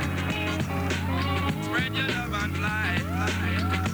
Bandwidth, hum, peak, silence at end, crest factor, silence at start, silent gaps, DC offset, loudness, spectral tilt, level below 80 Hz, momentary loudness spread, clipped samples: over 20 kHz; none; -14 dBFS; 0 s; 14 dB; 0 s; none; under 0.1%; -27 LUFS; -5.5 dB/octave; -42 dBFS; 2 LU; under 0.1%